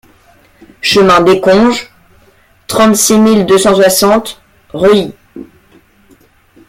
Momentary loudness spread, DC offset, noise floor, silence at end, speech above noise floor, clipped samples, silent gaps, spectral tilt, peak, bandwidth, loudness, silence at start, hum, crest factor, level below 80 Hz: 11 LU; under 0.1%; -47 dBFS; 1.25 s; 39 dB; under 0.1%; none; -4 dB/octave; 0 dBFS; 16.5 kHz; -8 LUFS; 0.85 s; none; 10 dB; -42 dBFS